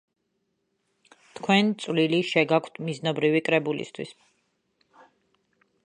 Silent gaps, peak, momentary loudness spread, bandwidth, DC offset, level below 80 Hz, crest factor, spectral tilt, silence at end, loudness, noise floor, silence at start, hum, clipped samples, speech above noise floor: none; -6 dBFS; 13 LU; 10 kHz; under 0.1%; -76 dBFS; 22 dB; -5.5 dB/octave; 1.7 s; -24 LUFS; -76 dBFS; 1.35 s; none; under 0.1%; 51 dB